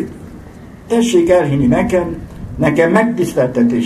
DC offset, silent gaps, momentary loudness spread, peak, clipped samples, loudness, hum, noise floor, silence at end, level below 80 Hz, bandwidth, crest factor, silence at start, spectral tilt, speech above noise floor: under 0.1%; none; 16 LU; 0 dBFS; under 0.1%; -14 LUFS; none; -35 dBFS; 0 s; -38 dBFS; 13.5 kHz; 14 dB; 0 s; -6.5 dB/octave; 22 dB